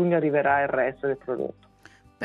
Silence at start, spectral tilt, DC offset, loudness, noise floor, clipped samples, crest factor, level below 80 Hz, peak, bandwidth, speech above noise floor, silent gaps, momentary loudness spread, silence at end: 0 s; -9 dB/octave; under 0.1%; -25 LUFS; -54 dBFS; under 0.1%; 16 dB; -62 dBFS; -10 dBFS; 6.8 kHz; 30 dB; none; 10 LU; 0 s